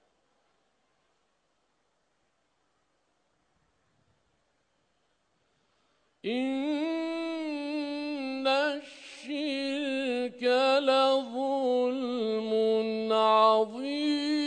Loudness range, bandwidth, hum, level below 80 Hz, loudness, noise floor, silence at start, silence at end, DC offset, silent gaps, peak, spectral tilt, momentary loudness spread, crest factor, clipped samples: 10 LU; 10 kHz; none; -82 dBFS; -28 LUFS; -75 dBFS; 6.25 s; 0 s; under 0.1%; none; -10 dBFS; -4 dB/octave; 10 LU; 20 dB; under 0.1%